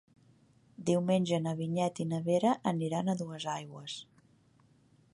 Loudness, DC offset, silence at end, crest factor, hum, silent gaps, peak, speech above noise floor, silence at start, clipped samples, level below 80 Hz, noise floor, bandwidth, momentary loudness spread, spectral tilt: -33 LUFS; under 0.1%; 1.1 s; 18 dB; none; none; -16 dBFS; 34 dB; 0.8 s; under 0.1%; -76 dBFS; -66 dBFS; 11.5 kHz; 12 LU; -6.5 dB/octave